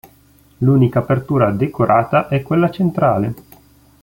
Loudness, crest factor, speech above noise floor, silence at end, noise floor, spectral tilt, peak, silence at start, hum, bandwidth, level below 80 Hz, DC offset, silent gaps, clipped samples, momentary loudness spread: -16 LUFS; 14 dB; 35 dB; 0.65 s; -50 dBFS; -9.5 dB/octave; -2 dBFS; 0.6 s; none; 16.5 kHz; -48 dBFS; under 0.1%; none; under 0.1%; 6 LU